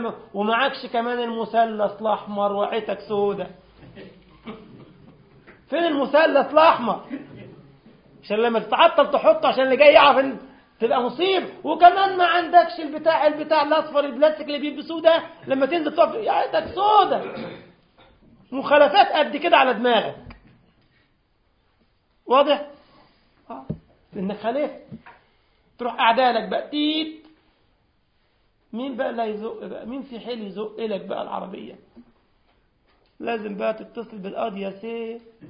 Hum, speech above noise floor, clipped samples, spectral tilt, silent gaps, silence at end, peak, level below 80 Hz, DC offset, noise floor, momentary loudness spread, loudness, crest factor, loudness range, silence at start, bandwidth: none; 44 dB; under 0.1%; -9 dB/octave; none; 0 s; 0 dBFS; -62 dBFS; under 0.1%; -65 dBFS; 19 LU; -20 LUFS; 22 dB; 14 LU; 0 s; 5.4 kHz